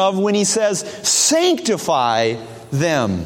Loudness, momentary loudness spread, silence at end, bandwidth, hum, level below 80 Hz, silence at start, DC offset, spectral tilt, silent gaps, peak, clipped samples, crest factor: -17 LUFS; 8 LU; 0 s; 16.5 kHz; none; -52 dBFS; 0 s; under 0.1%; -3 dB/octave; none; -4 dBFS; under 0.1%; 14 dB